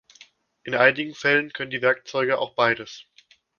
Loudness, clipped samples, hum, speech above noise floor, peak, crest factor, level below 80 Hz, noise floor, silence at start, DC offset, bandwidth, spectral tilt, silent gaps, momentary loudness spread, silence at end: -22 LUFS; under 0.1%; none; 31 dB; -2 dBFS; 24 dB; -68 dBFS; -54 dBFS; 0.65 s; under 0.1%; 7 kHz; -4.5 dB/octave; none; 14 LU; 0.55 s